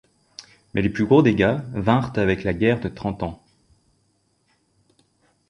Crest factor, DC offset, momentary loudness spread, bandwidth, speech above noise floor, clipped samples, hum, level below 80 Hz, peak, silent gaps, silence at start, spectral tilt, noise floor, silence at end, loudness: 20 dB; under 0.1%; 24 LU; 10.5 kHz; 46 dB; under 0.1%; none; -46 dBFS; -4 dBFS; none; 0.4 s; -8 dB/octave; -66 dBFS; 2.15 s; -21 LUFS